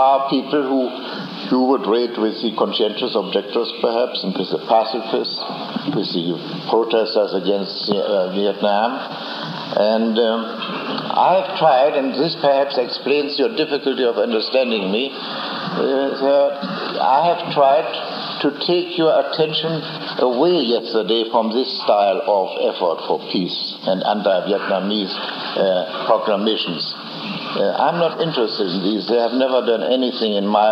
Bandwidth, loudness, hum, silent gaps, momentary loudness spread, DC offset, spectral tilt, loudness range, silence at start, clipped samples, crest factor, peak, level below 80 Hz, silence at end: 6.6 kHz; -19 LUFS; none; none; 8 LU; under 0.1%; -7 dB/octave; 3 LU; 0 s; under 0.1%; 16 dB; -2 dBFS; -78 dBFS; 0 s